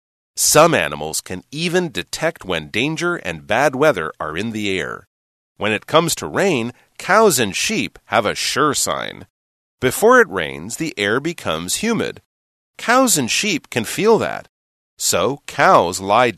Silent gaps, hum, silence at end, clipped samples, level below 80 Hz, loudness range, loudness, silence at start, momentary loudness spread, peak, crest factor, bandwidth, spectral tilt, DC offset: 5.07-5.55 s, 9.30-9.78 s, 12.26-12.74 s, 14.49-14.97 s; none; 0 s; under 0.1%; -52 dBFS; 3 LU; -17 LUFS; 0.35 s; 12 LU; 0 dBFS; 18 dB; 13.5 kHz; -3 dB/octave; under 0.1%